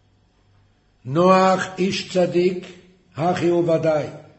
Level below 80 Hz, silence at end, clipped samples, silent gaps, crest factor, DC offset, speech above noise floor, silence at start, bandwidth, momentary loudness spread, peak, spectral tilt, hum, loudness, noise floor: -58 dBFS; 0.2 s; under 0.1%; none; 18 dB; under 0.1%; 40 dB; 1.05 s; 8.4 kHz; 10 LU; -4 dBFS; -6 dB/octave; none; -19 LUFS; -59 dBFS